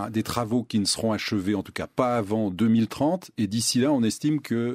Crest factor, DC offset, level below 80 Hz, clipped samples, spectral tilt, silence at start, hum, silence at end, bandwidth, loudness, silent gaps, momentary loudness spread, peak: 18 dB; under 0.1%; -58 dBFS; under 0.1%; -5 dB/octave; 0 s; none; 0 s; 16 kHz; -25 LUFS; none; 6 LU; -8 dBFS